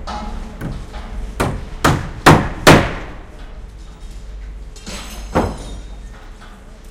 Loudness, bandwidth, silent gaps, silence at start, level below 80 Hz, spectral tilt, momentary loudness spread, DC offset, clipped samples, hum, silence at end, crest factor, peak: -15 LUFS; 16 kHz; none; 0 s; -28 dBFS; -5 dB/octave; 26 LU; under 0.1%; 0.2%; none; 0 s; 18 dB; 0 dBFS